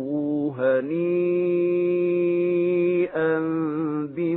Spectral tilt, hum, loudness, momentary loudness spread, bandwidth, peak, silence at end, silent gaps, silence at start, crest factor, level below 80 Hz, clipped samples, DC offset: -12.5 dB/octave; none; -23 LUFS; 4 LU; 4 kHz; -10 dBFS; 0 s; none; 0 s; 12 dB; -70 dBFS; under 0.1%; under 0.1%